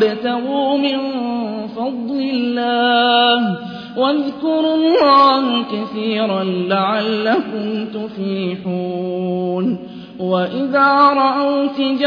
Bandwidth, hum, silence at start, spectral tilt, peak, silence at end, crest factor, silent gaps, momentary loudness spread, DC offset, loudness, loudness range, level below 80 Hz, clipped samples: 5.2 kHz; none; 0 s; -7.5 dB/octave; -2 dBFS; 0 s; 14 dB; none; 11 LU; under 0.1%; -17 LUFS; 6 LU; -62 dBFS; under 0.1%